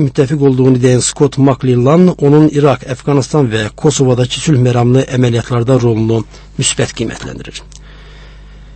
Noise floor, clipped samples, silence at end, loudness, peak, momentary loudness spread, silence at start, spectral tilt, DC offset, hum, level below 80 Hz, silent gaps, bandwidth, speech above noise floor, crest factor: -34 dBFS; 0.1%; 0 s; -11 LUFS; 0 dBFS; 10 LU; 0 s; -6 dB/octave; under 0.1%; 50 Hz at -35 dBFS; -36 dBFS; none; 8.8 kHz; 23 dB; 12 dB